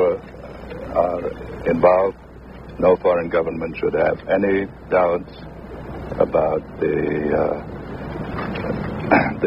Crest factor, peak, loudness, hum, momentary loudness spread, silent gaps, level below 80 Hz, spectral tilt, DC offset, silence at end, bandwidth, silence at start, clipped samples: 20 dB; 0 dBFS; -21 LUFS; none; 18 LU; none; -42 dBFS; -9 dB/octave; under 0.1%; 0 s; 5.6 kHz; 0 s; under 0.1%